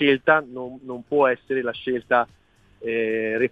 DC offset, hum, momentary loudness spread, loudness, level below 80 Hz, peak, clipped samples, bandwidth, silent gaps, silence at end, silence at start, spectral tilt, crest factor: under 0.1%; none; 15 LU; -22 LUFS; -62 dBFS; -2 dBFS; under 0.1%; 4.9 kHz; none; 0.05 s; 0 s; -7 dB/octave; 20 dB